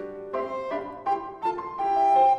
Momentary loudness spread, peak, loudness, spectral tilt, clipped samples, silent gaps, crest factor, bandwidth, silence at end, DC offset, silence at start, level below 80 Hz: 11 LU; -10 dBFS; -27 LUFS; -5.5 dB/octave; under 0.1%; none; 14 dB; 7.6 kHz; 0 s; under 0.1%; 0 s; -62 dBFS